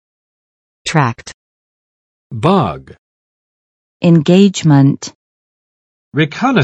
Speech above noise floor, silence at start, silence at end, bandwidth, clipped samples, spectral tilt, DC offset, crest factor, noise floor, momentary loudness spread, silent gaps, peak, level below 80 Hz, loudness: over 79 dB; 0.85 s; 0 s; 8.8 kHz; under 0.1%; -6.5 dB/octave; under 0.1%; 16 dB; under -90 dBFS; 19 LU; 1.34-2.30 s, 2.98-4.00 s, 5.15-6.12 s; 0 dBFS; -50 dBFS; -13 LUFS